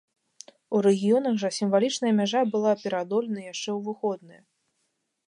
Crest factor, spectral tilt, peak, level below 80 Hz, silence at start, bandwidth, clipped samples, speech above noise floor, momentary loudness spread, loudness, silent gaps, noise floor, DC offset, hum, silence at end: 16 dB; -5 dB/octave; -10 dBFS; -78 dBFS; 0.7 s; 11 kHz; under 0.1%; 51 dB; 9 LU; -25 LUFS; none; -76 dBFS; under 0.1%; none; 1 s